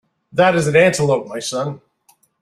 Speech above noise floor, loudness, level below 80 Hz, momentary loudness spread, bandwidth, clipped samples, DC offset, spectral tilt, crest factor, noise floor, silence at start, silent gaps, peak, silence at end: 42 dB; -17 LUFS; -56 dBFS; 12 LU; 14.5 kHz; under 0.1%; under 0.1%; -5 dB/octave; 16 dB; -58 dBFS; 0.35 s; none; -2 dBFS; 0.65 s